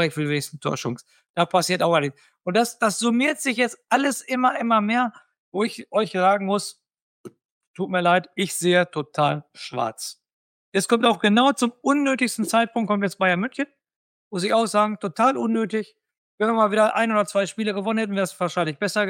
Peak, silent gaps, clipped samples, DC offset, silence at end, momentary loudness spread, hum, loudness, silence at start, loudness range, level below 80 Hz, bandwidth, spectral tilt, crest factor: -4 dBFS; 1.29-1.34 s, 5.38-5.52 s, 7.01-7.24 s, 7.45-7.61 s, 7.67-7.74 s, 10.33-10.72 s, 13.96-14.31 s, 16.18-16.38 s; under 0.1%; under 0.1%; 0 s; 10 LU; none; -22 LUFS; 0 s; 3 LU; -74 dBFS; 17 kHz; -4.5 dB/octave; 18 dB